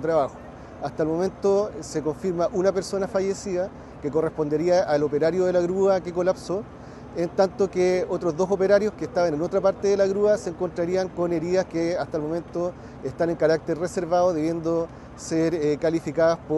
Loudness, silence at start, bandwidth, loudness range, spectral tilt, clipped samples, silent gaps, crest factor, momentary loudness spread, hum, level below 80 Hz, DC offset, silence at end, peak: -24 LUFS; 0 s; 12 kHz; 3 LU; -6.5 dB/octave; under 0.1%; none; 18 dB; 9 LU; none; -52 dBFS; under 0.1%; 0 s; -6 dBFS